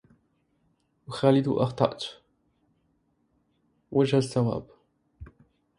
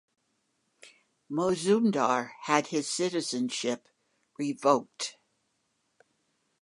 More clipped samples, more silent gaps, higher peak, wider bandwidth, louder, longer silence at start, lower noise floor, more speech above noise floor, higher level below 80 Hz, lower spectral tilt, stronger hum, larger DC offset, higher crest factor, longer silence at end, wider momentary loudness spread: neither; neither; about the same, -6 dBFS vs -8 dBFS; about the same, 11.5 kHz vs 11.5 kHz; first, -26 LUFS vs -29 LUFS; first, 1.1 s vs 0.85 s; second, -71 dBFS vs -76 dBFS; about the same, 46 dB vs 48 dB; first, -60 dBFS vs -78 dBFS; first, -7 dB/octave vs -4 dB/octave; neither; neither; about the same, 24 dB vs 24 dB; second, 0.55 s vs 1.5 s; first, 14 LU vs 11 LU